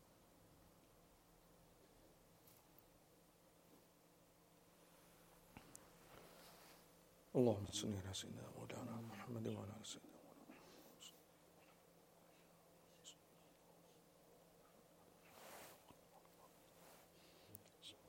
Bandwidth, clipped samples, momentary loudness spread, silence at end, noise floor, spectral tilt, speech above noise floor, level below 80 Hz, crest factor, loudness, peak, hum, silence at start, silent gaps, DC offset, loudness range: 16.5 kHz; under 0.1%; 23 LU; 0 s; -72 dBFS; -5 dB/octave; 26 dB; -82 dBFS; 30 dB; -49 LUFS; -24 dBFS; none; 0 s; none; under 0.1%; 23 LU